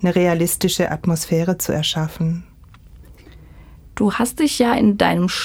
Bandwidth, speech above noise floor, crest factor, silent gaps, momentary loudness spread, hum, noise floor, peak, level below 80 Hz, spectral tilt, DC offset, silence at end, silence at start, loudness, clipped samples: 18.5 kHz; 26 dB; 18 dB; none; 7 LU; none; -44 dBFS; -2 dBFS; -44 dBFS; -5 dB/octave; under 0.1%; 0 s; 0 s; -18 LUFS; under 0.1%